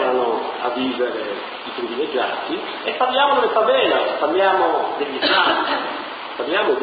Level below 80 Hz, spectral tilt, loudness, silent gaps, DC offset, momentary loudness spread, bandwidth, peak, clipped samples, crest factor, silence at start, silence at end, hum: -62 dBFS; -6.5 dB/octave; -19 LUFS; none; under 0.1%; 11 LU; 5 kHz; -4 dBFS; under 0.1%; 16 dB; 0 s; 0 s; none